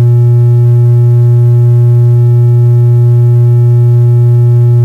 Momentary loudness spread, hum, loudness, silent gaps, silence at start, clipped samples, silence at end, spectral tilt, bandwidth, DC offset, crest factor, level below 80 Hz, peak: 0 LU; none; -6 LUFS; none; 0 s; under 0.1%; 0 s; -11 dB/octave; 1.9 kHz; under 0.1%; 2 dB; -42 dBFS; -2 dBFS